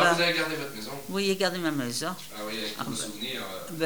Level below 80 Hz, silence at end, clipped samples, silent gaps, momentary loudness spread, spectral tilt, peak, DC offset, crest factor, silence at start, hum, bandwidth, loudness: -64 dBFS; 0 s; under 0.1%; none; 11 LU; -3.5 dB/octave; -6 dBFS; 0.5%; 22 dB; 0 s; none; over 20 kHz; -29 LUFS